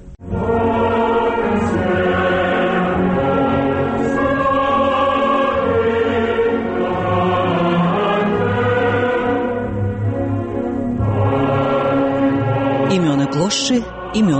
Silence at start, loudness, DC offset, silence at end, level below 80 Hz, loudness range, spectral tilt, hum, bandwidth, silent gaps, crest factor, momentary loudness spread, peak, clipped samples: 0 s; -17 LUFS; under 0.1%; 0 s; -38 dBFS; 2 LU; -6 dB/octave; none; 8.8 kHz; none; 10 dB; 5 LU; -6 dBFS; under 0.1%